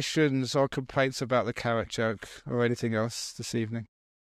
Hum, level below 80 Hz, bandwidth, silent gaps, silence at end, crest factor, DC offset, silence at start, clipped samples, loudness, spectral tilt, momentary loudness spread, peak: none; -60 dBFS; 15 kHz; none; 0.5 s; 16 dB; under 0.1%; 0 s; under 0.1%; -29 LUFS; -5 dB/octave; 8 LU; -14 dBFS